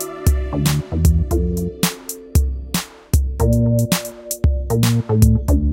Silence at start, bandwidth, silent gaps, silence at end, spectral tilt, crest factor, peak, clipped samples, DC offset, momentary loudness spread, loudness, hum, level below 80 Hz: 0 s; 17 kHz; none; 0 s; -6 dB/octave; 16 dB; -2 dBFS; under 0.1%; under 0.1%; 7 LU; -19 LUFS; none; -22 dBFS